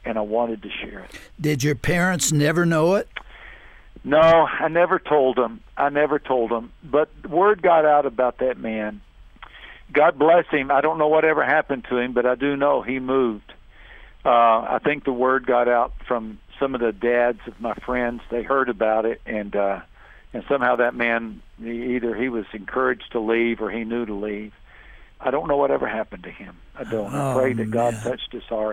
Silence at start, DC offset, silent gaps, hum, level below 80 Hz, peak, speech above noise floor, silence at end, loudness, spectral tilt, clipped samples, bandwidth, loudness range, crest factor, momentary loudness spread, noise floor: 0.05 s; under 0.1%; none; none; -46 dBFS; -6 dBFS; 25 dB; 0 s; -21 LUFS; -5 dB/octave; under 0.1%; 16 kHz; 5 LU; 16 dB; 14 LU; -46 dBFS